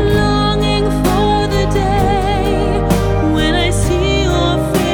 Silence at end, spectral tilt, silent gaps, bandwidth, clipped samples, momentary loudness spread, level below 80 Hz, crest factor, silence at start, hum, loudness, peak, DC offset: 0 s; -5.5 dB/octave; none; over 20 kHz; under 0.1%; 2 LU; -20 dBFS; 12 dB; 0 s; none; -14 LUFS; 0 dBFS; under 0.1%